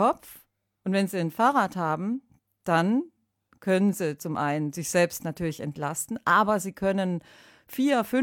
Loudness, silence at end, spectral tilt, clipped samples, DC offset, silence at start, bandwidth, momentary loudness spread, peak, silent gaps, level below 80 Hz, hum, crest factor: -26 LUFS; 0 s; -5.5 dB/octave; under 0.1%; under 0.1%; 0 s; 19 kHz; 13 LU; -8 dBFS; none; -62 dBFS; none; 18 dB